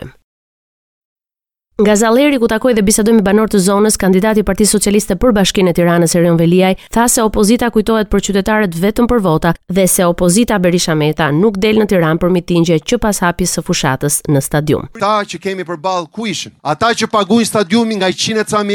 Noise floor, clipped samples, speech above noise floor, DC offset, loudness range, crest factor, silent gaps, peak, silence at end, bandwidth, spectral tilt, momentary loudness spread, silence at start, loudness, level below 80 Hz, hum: -89 dBFS; under 0.1%; 77 dB; under 0.1%; 4 LU; 12 dB; 0.24-1.16 s; 0 dBFS; 0 s; 19 kHz; -4.5 dB/octave; 5 LU; 0 s; -12 LUFS; -34 dBFS; none